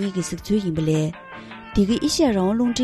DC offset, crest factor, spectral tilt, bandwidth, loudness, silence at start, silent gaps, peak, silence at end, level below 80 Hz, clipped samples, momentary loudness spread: under 0.1%; 16 dB; -5.5 dB/octave; 13.5 kHz; -22 LUFS; 0 s; none; -6 dBFS; 0 s; -42 dBFS; under 0.1%; 15 LU